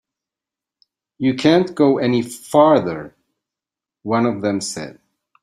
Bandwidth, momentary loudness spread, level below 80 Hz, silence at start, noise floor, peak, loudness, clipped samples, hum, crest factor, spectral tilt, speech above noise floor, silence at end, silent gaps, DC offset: 15 kHz; 16 LU; -60 dBFS; 1.2 s; -88 dBFS; -2 dBFS; -17 LUFS; under 0.1%; none; 18 dB; -5.5 dB/octave; 71 dB; 0.5 s; none; under 0.1%